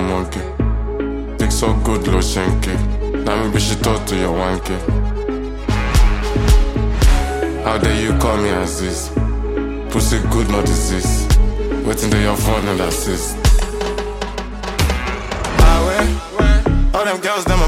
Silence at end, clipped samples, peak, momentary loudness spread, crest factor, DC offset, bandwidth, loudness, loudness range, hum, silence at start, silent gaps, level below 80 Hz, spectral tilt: 0 s; under 0.1%; 0 dBFS; 7 LU; 14 dB; under 0.1%; 16 kHz; -18 LUFS; 2 LU; none; 0 s; none; -18 dBFS; -5 dB/octave